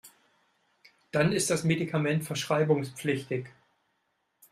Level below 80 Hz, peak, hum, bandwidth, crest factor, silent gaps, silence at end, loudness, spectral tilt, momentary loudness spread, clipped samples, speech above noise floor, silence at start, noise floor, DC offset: -68 dBFS; -12 dBFS; none; 15.5 kHz; 20 dB; none; 1.05 s; -28 LUFS; -5 dB/octave; 8 LU; under 0.1%; 49 dB; 0.05 s; -77 dBFS; under 0.1%